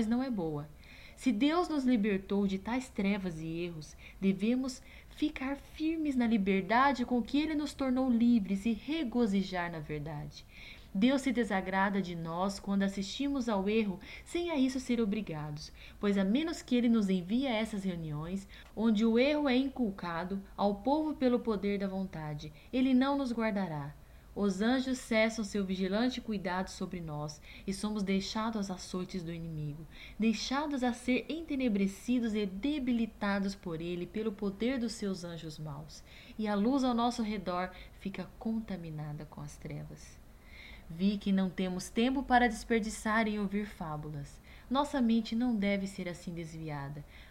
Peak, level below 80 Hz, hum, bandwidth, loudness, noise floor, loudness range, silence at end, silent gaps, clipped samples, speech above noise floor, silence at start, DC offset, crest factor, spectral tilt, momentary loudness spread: -14 dBFS; -54 dBFS; none; 15.5 kHz; -33 LUFS; -52 dBFS; 5 LU; 0 s; none; under 0.1%; 19 dB; 0 s; under 0.1%; 18 dB; -6 dB/octave; 15 LU